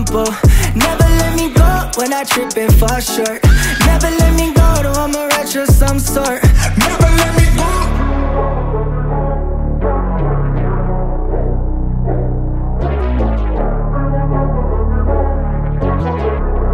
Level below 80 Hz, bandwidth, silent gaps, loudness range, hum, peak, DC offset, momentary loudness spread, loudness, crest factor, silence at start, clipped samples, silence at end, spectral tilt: -14 dBFS; 16.5 kHz; none; 5 LU; none; 0 dBFS; under 0.1%; 7 LU; -15 LUFS; 12 dB; 0 s; under 0.1%; 0 s; -5 dB/octave